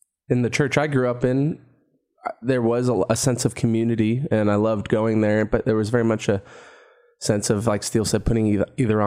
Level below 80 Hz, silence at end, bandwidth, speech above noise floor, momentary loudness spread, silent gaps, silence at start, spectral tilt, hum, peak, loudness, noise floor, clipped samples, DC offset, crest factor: -42 dBFS; 0 s; 16 kHz; 42 dB; 5 LU; none; 0.3 s; -6 dB/octave; none; -4 dBFS; -21 LUFS; -63 dBFS; under 0.1%; under 0.1%; 18 dB